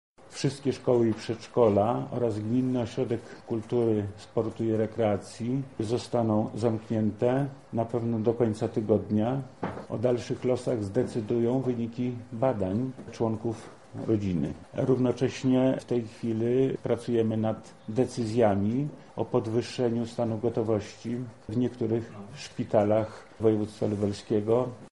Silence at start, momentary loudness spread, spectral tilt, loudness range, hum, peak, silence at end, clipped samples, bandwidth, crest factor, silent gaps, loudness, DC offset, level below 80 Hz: 0.3 s; 9 LU; -7.5 dB/octave; 3 LU; none; -10 dBFS; 0.05 s; under 0.1%; 11.5 kHz; 18 dB; none; -29 LUFS; 0.1%; -60 dBFS